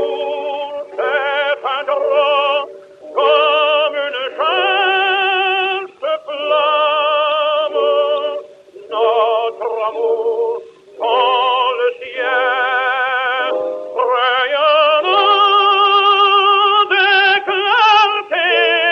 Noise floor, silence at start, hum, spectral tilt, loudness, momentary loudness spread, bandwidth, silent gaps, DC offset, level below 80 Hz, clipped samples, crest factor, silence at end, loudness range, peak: -37 dBFS; 0 s; none; -2 dB/octave; -14 LUFS; 11 LU; 7 kHz; none; under 0.1%; -74 dBFS; under 0.1%; 14 dB; 0 s; 6 LU; 0 dBFS